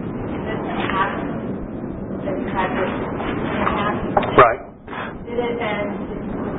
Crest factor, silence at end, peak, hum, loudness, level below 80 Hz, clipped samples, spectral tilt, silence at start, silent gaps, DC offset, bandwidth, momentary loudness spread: 22 dB; 0 s; 0 dBFS; none; -22 LUFS; -40 dBFS; under 0.1%; -11 dB/octave; 0 s; none; under 0.1%; 4 kHz; 13 LU